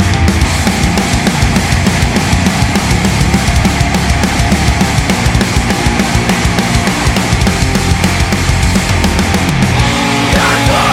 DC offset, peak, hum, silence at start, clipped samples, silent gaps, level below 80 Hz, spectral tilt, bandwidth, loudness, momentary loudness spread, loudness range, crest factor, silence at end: under 0.1%; 0 dBFS; none; 0 s; under 0.1%; none; -18 dBFS; -4.5 dB/octave; 17 kHz; -11 LUFS; 1 LU; 0 LU; 10 dB; 0 s